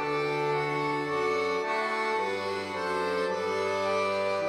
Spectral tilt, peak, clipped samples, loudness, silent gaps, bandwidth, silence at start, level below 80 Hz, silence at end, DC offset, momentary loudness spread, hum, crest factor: -4.5 dB/octave; -18 dBFS; under 0.1%; -29 LUFS; none; 15 kHz; 0 s; -68 dBFS; 0 s; under 0.1%; 3 LU; none; 12 dB